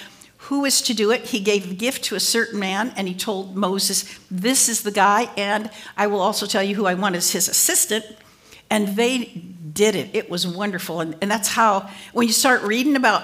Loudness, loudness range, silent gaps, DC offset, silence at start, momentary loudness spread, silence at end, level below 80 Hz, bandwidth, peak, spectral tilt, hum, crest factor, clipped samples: -20 LUFS; 3 LU; none; under 0.1%; 0 s; 9 LU; 0 s; -66 dBFS; 16 kHz; -2 dBFS; -2.5 dB/octave; none; 18 dB; under 0.1%